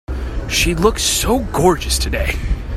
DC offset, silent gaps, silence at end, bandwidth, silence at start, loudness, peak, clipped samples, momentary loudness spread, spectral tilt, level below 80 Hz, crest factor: under 0.1%; none; 0 s; 16 kHz; 0.1 s; -17 LUFS; 0 dBFS; under 0.1%; 8 LU; -3.5 dB/octave; -22 dBFS; 16 dB